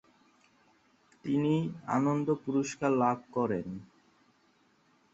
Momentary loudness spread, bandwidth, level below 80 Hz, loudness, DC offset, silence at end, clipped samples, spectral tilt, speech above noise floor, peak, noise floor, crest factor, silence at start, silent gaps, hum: 9 LU; 8 kHz; -68 dBFS; -31 LUFS; under 0.1%; 1.3 s; under 0.1%; -7 dB/octave; 38 dB; -14 dBFS; -68 dBFS; 20 dB; 1.25 s; none; none